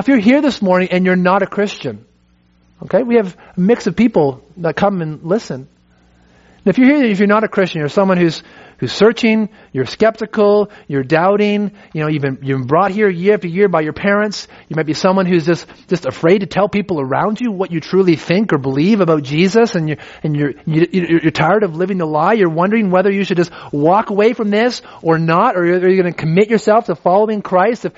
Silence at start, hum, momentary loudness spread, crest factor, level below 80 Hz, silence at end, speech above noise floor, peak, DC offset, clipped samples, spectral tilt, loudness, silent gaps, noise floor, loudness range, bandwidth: 0 s; none; 8 LU; 14 dB; -52 dBFS; 0.05 s; 40 dB; 0 dBFS; under 0.1%; under 0.1%; -5.5 dB/octave; -14 LUFS; none; -54 dBFS; 3 LU; 8 kHz